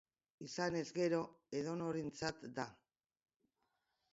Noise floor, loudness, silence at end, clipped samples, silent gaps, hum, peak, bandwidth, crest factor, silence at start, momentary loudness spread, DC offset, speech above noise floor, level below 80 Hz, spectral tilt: -86 dBFS; -42 LUFS; 1.4 s; under 0.1%; none; none; -24 dBFS; 7.6 kHz; 20 dB; 0.4 s; 10 LU; under 0.1%; 44 dB; -76 dBFS; -5 dB/octave